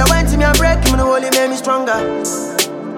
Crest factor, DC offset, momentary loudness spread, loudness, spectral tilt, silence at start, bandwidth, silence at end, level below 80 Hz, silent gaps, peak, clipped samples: 14 dB; under 0.1%; 6 LU; -14 LUFS; -4 dB/octave; 0 s; 17 kHz; 0 s; -20 dBFS; none; 0 dBFS; under 0.1%